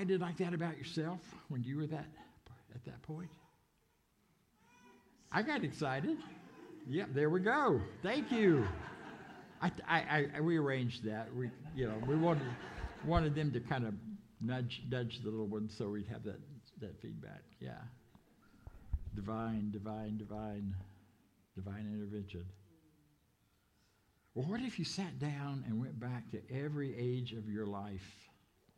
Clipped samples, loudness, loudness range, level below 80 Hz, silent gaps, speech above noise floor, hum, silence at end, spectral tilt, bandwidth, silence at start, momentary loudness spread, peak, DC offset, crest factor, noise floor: under 0.1%; -39 LUFS; 12 LU; -58 dBFS; none; 38 dB; none; 0.5 s; -7 dB/octave; 11.5 kHz; 0 s; 18 LU; -16 dBFS; under 0.1%; 22 dB; -76 dBFS